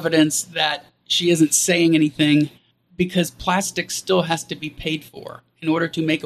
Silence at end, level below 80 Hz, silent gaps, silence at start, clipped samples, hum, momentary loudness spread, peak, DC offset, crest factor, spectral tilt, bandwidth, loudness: 0 s; -52 dBFS; none; 0 s; under 0.1%; none; 13 LU; -4 dBFS; under 0.1%; 18 dB; -3.5 dB/octave; 14 kHz; -20 LUFS